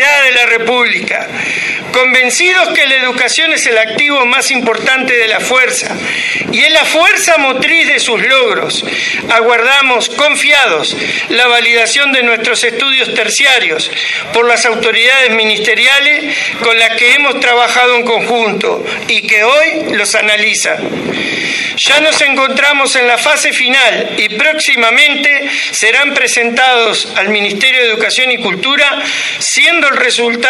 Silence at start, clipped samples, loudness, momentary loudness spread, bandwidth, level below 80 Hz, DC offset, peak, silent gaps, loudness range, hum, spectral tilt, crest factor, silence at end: 0 s; 0.4%; -8 LUFS; 7 LU; 14 kHz; -56 dBFS; under 0.1%; 0 dBFS; none; 2 LU; none; -1 dB/octave; 10 dB; 0 s